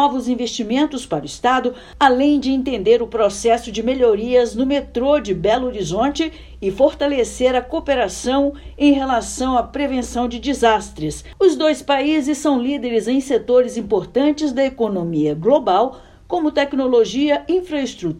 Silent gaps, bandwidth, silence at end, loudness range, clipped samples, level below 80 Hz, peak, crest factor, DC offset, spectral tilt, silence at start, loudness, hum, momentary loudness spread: none; 12.5 kHz; 0 s; 2 LU; under 0.1%; -42 dBFS; 0 dBFS; 18 dB; under 0.1%; -4.5 dB/octave; 0 s; -18 LUFS; none; 6 LU